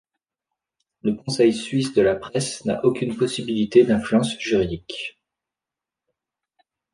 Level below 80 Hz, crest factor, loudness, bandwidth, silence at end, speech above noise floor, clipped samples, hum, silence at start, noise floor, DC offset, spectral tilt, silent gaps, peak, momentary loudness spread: -52 dBFS; 20 dB; -22 LUFS; 10.5 kHz; 1.85 s; 68 dB; under 0.1%; none; 1.05 s; -88 dBFS; under 0.1%; -5.5 dB/octave; none; -4 dBFS; 11 LU